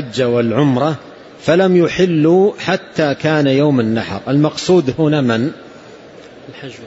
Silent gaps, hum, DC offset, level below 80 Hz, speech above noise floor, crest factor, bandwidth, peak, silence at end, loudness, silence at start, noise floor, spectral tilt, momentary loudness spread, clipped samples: none; none; under 0.1%; -52 dBFS; 24 dB; 12 dB; 8 kHz; -2 dBFS; 0 s; -14 LUFS; 0 s; -37 dBFS; -6.5 dB/octave; 9 LU; under 0.1%